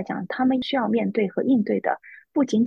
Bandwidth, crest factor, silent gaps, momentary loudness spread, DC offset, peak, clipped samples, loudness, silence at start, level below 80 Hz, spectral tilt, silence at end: 7.2 kHz; 14 dB; none; 7 LU; under 0.1%; -8 dBFS; under 0.1%; -24 LUFS; 0 s; -66 dBFS; -6.5 dB/octave; 0 s